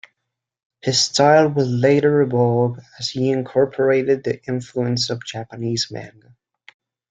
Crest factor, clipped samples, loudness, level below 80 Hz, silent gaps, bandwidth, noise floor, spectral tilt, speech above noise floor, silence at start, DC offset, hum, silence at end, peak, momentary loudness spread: 18 dB; under 0.1%; -19 LUFS; -60 dBFS; none; 9.4 kHz; -80 dBFS; -5 dB/octave; 62 dB; 0.85 s; under 0.1%; none; 1 s; -2 dBFS; 12 LU